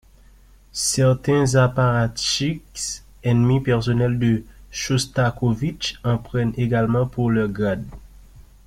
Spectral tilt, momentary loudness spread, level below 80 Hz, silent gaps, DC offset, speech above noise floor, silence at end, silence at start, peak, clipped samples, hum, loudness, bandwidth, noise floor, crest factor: -5.5 dB/octave; 10 LU; -42 dBFS; none; under 0.1%; 29 dB; 0.25 s; 0.75 s; -4 dBFS; under 0.1%; none; -21 LUFS; 14.5 kHz; -49 dBFS; 16 dB